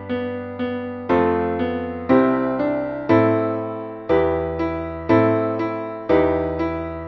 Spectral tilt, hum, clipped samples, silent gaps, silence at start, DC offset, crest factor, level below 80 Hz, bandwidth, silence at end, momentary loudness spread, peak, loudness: -9.5 dB/octave; none; under 0.1%; none; 0 s; under 0.1%; 16 dB; -44 dBFS; 6 kHz; 0 s; 10 LU; -4 dBFS; -21 LUFS